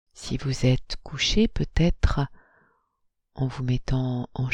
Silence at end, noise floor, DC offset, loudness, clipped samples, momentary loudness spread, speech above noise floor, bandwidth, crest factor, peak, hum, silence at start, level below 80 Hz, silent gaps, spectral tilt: 0 s; -73 dBFS; under 0.1%; -26 LUFS; under 0.1%; 8 LU; 49 dB; 9.8 kHz; 18 dB; -6 dBFS; none; 0.15 s; -32 dBFS; none; -5.5 dB/octave